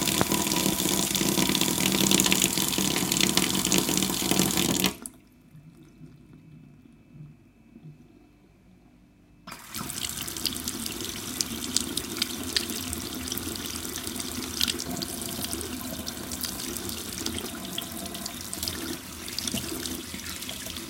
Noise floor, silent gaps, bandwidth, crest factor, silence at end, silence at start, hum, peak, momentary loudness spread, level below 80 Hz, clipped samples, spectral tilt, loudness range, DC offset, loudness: -56 dBFS; none; 17 kHz; 30 dB; 0 s; 0 s; none; 0 dBFS; 12 LU; -50 dBFS; under 0.1%; -2.5 dB/octave; 12 LU; under 0.1%; -27 LUFS